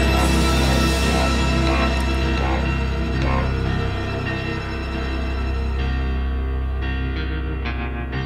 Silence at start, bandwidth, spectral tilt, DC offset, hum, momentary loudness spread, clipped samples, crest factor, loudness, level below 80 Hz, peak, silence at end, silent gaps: 0 s; 15 kHz; -5.5 dB/octave; under 0.1%; none; 8 LU; under 0.1%; 14 dB; -22 LUFS; -24 dBFS; -6 dBFS; 0 s; none